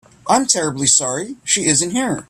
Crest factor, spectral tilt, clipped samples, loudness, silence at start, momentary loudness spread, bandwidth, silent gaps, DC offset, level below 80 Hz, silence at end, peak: 18 dB; -2 dB/octave; under 0.1%; -15 LUFS; 0.25 s; 7 LU; 15 kHz; none; under 0.1%; -54 dBFS; 0.05 s; 0 dBFS